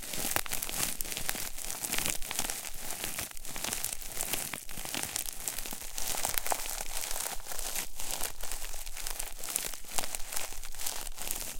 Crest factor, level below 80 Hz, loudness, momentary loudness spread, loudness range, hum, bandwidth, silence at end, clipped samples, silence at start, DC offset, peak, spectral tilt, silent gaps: 28 dB; -44 dBFS; -34 LUFS; 7 LU; 2 LU; none; 17 kHz; 0 s; under 0.1%; 0 s; under 0.1%; -6 dBFS; -0.5 dB/octave; none